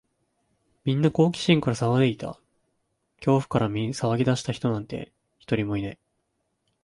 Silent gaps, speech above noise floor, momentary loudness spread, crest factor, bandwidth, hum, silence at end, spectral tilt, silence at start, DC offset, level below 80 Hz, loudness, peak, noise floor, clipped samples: none; 52 dB; 14 LU; 20 dB; 11.5 kHz; none; 0.9 s; -6.5 dB/octave; 0.85 s; under 0.1%; -56 dBFS; -25 LUFS; -6 dBFS; -75 dBFS; under 0.1%